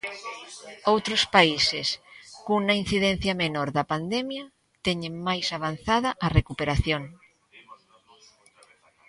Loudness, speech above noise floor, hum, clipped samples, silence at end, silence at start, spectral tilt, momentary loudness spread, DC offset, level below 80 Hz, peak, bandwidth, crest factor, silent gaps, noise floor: -25 LUFS; 33 dB; none; under 0.1%; 1.35 s; 0.05 s; -4.5 dB/octave; 17 LU; under 0.1%; -42 dBFS; -2 dBFS; 11.5 kHz; 24 dB; none; -59 dBFS